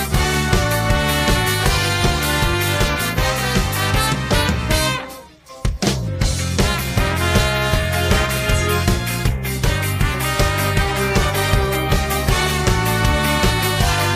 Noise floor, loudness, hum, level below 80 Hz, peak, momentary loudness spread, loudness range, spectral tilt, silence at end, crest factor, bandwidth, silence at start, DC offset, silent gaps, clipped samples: -39 dBFS; -18 LUFS; none; -24 dBFS; -2 dBFS; 4 LU; 2 LU; -4 dB/octave; 0 s; 16 dB; 16 kHz; 0 s; under 0.1%; none; under 0.1%